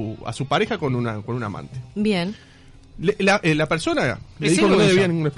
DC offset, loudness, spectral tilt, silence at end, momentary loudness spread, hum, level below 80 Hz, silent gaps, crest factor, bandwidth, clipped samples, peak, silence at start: under 0.1%; -21 LUFS; -5.5 dB/octave; 0.05 s; 14 LU; none; -48 dBFS; none; 12 dB; 11.5 kHz; under 0.1%; -8 dBFS; 0 s